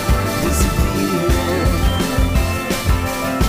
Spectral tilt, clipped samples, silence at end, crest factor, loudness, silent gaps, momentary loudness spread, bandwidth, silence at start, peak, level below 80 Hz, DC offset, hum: -5 dB/octave; under 0.1%; 0 s; 12 dB; -18 LUFS; none; 2 LU; 16 kHz; 0 s; -4 dBFS; -20 dBFS; under 0.1%; none